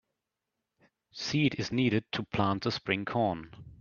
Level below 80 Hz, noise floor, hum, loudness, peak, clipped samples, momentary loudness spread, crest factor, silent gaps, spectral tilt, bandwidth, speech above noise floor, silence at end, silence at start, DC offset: -62 dBFS; -86 dBFS; none; -31 LUFS; -10 dBFS; under 0.1%; 11 LU; 22 dB; none; -6 dB/octave; 7.2 kHz; 56 dB; 0.05 s; 1.15 s; under 0.1%